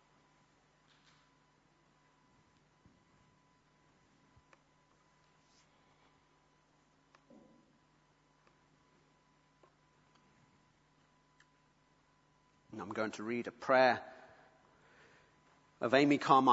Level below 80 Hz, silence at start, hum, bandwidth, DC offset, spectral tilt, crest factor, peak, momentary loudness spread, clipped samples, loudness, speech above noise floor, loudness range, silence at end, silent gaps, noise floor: -82 dBFS; 12.75 s; none; 7.6 kHz; under 0.1%; -3 dB/octave; 28 dB; -12 dBFS; 23 LU; under 0.1%; -32 LUFS; 41 dB; 14 LU; 0 s; none; -72 dBFS